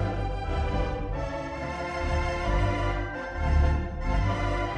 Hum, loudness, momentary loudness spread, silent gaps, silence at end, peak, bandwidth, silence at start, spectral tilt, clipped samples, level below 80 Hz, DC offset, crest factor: none; -29 LUFS; 7 LU; none; 0 s; -12 dBFS; 9 kHz; 0 s; -7 dB/octave; under 0.1%; -30 dBFS; under 0.1%; 14 dB